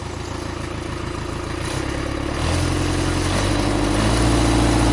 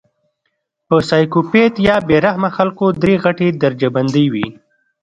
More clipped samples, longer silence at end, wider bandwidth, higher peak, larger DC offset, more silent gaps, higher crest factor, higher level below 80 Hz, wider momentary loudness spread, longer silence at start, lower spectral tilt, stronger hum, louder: neither; second, 0 s vs 0.5 s; first, 11.5 kHz vs 9.2 kHz; second, -6 dBFS vs 0 dBFS; neither; neither; about the same, 16 dB vs 14 dB; first, -28 dBFS vs -46 dBFS; first, 11 LU vs 4 LU; second, 0 s vs 0.9 s; second, -5 dB/octave vs -7.5 dB/octave; neither; second, -21 LUFS vs -14 LUFS